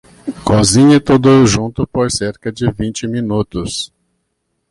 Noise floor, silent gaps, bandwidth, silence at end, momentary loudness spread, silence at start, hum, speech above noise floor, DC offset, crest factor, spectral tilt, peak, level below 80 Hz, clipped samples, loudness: -69 dBFS; none; 11.5 kHz; 0.85 s; 13 LU; 0.25 s; none; 56 dB; under 0.1%; 12 dB; -5.5 dB/octave; 0 dBFS; -36 dBFS; under 0.1%; -13 LUFS